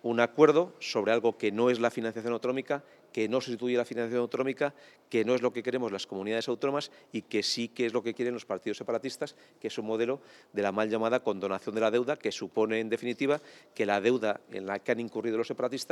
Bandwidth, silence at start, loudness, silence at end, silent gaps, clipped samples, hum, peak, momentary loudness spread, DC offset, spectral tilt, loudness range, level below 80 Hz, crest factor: 13 kHz; 0.05 s; -30 LUFS; 0.05 s; none; under 0.1%; none; -6 dBFS; 9 LU; under 0.1%; -5 dB/octave; 3 LU; -90 dBFS; 24 dB